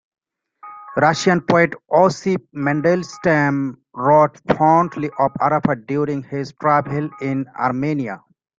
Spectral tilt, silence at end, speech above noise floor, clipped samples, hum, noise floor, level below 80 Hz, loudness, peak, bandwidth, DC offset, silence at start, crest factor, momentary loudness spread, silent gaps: -6.5 dB/octave; 0.4 s; 28 dB; under 0.1%; none; -46 dBFS; -56 dBFS; -18 LUFS; -2 dBFS; 7.8 kHz; under 0.1%; 0.65 s; 18 dB; 10 LU; none